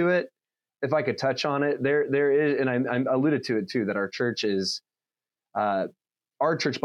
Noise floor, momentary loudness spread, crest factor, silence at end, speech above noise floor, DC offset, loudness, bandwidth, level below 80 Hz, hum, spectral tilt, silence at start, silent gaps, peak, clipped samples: under -90 dBFS; 7 LU; 16 dB; 0.05 s; over 65 dB; under 0.1%; -26 LUFS; 11 kHz; -78 dBFS; none; -5.5 dB/octave; 0 s; none; -10 dBFS; under 0.1%